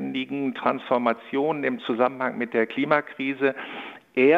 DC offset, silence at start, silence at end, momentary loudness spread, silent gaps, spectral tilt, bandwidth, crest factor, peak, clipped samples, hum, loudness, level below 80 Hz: under 0.1%; 0 s; 0 s; 7 LU; none; -7.5 dB/octave; 5.2 kHz; 20 dB; -4 dBFS; under 0.1%; none; -25 LUFS; -74 dBFS